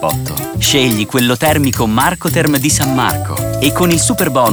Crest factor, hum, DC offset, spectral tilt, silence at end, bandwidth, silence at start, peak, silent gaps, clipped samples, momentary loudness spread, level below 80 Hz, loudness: 12 dB; none; 0.2%; -4 dB/octave; 0 s; over 20 kHz; 0 s; 0 dBFS; none; under 0.1%; 6 LU; -34 dBFS; -13 LUFS